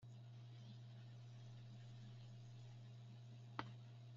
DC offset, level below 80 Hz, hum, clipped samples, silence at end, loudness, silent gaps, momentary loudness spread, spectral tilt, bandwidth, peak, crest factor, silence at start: under 0.1%; -78 dBFS; none; under 0.1%; 0 s; -58 LUFS; none; 6 LU; -5.5 dB/octave; 7.4 kHz; -26 dBFS; 32 dB; 0 s